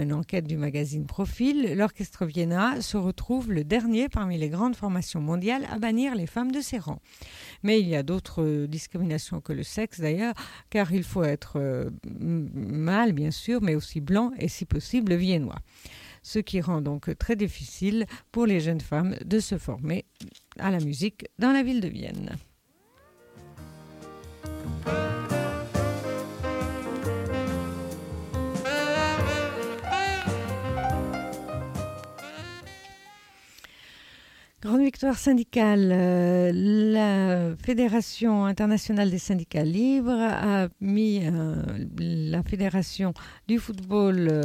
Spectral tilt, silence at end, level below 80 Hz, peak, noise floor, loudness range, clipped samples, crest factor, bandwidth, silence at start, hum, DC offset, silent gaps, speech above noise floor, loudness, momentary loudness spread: -6.5 dB/octave; 0 s; -46 dBFS; -12 dBFS; -63 dBFS; 8 LU; under 0.1%; 16 dB; 16 kHz; 0 s; none; under 0.1%; none; 38 dB; -27 LUFS; 14 LU